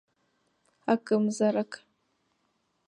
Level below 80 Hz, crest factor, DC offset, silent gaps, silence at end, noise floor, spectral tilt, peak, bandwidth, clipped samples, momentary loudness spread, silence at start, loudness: -80 dBFS; 20 dB; under 0.1%; none; 1.1 s; -75 dBFS; -6 dB/octave; -10 dBFS; 10 kHz; under 0.1%; 13 LU; 0.85 s; -28 LUFS